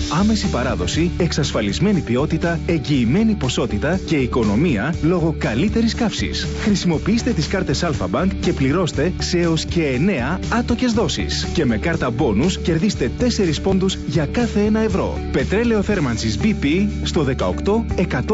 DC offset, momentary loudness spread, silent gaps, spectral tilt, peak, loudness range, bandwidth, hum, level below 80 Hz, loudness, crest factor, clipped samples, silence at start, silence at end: under 0.1%; 3 LU; none; -6 dB/octave; -6 dBFS; 1 LU; 8 kHz; none; -30 dBFS; -19 LUFS; 14 dB; under 0.1%; 0 s; 0 s